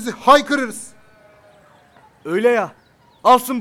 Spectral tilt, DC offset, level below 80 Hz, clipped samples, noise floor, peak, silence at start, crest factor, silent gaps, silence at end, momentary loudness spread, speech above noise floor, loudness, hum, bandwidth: -3.5 dB/octave; under 0.1%; -58 dBFS; under 0.1%; -50 dBFS; 0 dBFS; 0 s; 18 dB; none; 0 s; 20 LU; 35 dB; -16 LUFS; none; 17 kHz